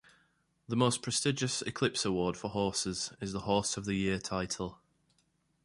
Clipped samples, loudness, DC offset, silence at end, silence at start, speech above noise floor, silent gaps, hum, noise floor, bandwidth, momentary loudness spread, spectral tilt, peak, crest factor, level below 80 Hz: under 0.1%; -33 LUFS; under 0.1%; 0.9 s; 0.7 s; 42 dB; none; none; -74 dBFS; 11.5 kHz; 7 LU; -4 dB/octave; -12 dBFS; 22 dB; -58 dBFS